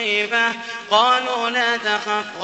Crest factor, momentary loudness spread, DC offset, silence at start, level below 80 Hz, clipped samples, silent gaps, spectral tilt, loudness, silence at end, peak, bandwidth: 18 dB; 6 LU; under 0.1%; 0 s; -70 dBFS; under 0.1%; none; -1.5 dB/octave; -19 LUFS; 0 s; -2 dBFS; 8.4 kHz